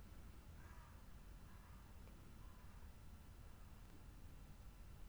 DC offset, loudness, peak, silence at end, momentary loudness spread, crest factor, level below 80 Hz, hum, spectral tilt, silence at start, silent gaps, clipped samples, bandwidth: under 0.1%; -62 LUFS; -46 dBFS; 0 s; 1 LU; 12 dB; -60 dBFS; none; -5.5 dB/octave; 0 s; none; under 0.1%; over 20 kHz